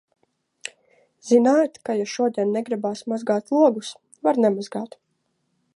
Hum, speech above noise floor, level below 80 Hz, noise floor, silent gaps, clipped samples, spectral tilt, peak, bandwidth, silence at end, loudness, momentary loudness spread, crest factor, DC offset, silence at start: none; 51 dB; -78 dBFS; -72 dBFS; none; under 0.1%; -5.5 dB/octave; -4 dBFS; 11.5 kHz; 0.9 s; -22 LUFS; 19 LU; 18 dB; under 0.1%; 0.65 s